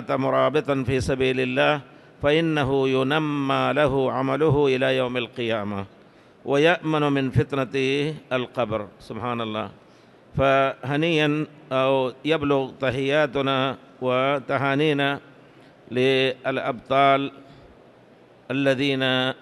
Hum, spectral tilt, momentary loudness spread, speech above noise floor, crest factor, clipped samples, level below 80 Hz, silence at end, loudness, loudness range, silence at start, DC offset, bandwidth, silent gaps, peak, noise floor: none; -6.5 dB/octave; 9 LU; 29 dB; 16 dB; under 0.1%; -50 dBFS; 0.05 s; -23 LUFS; 3 LU; 0 s; under 0.1%; 12 kHz; none; -6 dBFS; -52 dBFS